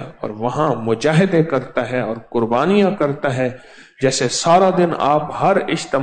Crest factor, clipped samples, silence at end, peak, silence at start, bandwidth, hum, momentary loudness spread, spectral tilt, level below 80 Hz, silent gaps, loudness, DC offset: 14 dB; under 0.1%; 0 s; -4 dBFS; 0 s; 9.4 kHz; none; 8 LU; -5.5 dB/octave; -52 dBFS; none; -17 LUFS; under 0.1%